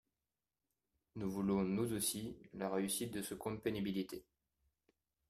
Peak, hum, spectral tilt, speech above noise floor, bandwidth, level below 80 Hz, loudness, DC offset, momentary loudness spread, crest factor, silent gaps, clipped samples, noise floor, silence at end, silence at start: -22 dBFS; none; -4.5 dB/octave; over 50 dB; 15.5 kHz; -68 dBFS; -40 LUFS; under 0.1%; 11 LU; 20 dB; none; under 0.1%; under -90 dBFS; 1.1 s; 1.15 s